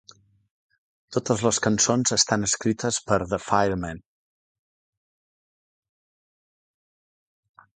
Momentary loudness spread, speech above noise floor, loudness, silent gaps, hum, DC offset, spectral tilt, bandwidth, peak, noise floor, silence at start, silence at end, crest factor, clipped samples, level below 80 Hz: 10 LU; over 67 dB; -23 LUFS; none; none; under 0.1%; -3.5 dB/octave; 9.6 kHz; -4 dBFS; under -90 dBFS; 1.1 s; 3.75 s; 24 dB; under 0.1%; -54 dBFS